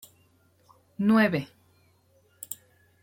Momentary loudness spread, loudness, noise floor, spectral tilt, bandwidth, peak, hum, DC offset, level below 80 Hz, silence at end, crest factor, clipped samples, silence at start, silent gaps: 24 LU; -26 LUFS; -64 dBFS; -6 dB/octave; 16.5 kHz; -10 dBFS; none; under 0.1%; -70 dBFS; 0.5 s; 20 dB; under 0.1%; 1 s; none